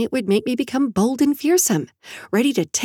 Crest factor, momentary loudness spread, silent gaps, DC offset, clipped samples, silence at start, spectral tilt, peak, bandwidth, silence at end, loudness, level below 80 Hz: 14 dB; 7 LU; none; under 0.1%; under 0.1%; 0 s; -4 dB/octave; -6 dBFS; 18 kHz; 0 s; -19 LUFS; -58 dBFS